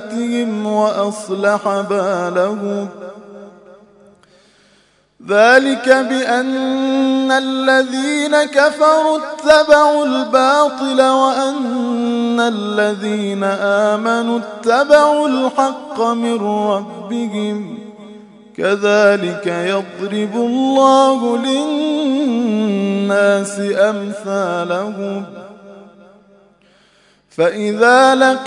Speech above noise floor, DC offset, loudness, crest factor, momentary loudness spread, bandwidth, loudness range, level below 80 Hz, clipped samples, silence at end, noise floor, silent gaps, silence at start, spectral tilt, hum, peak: 40 dB; under 0.1%; -15 LUFS; 16 dB; 11 LU; 11 kHz; 8 LU; -60 dBFS; under 0.1%; 0 s; -54 dBFS; none; 0 s; -4.5 dB/octave; none; 0 dBFS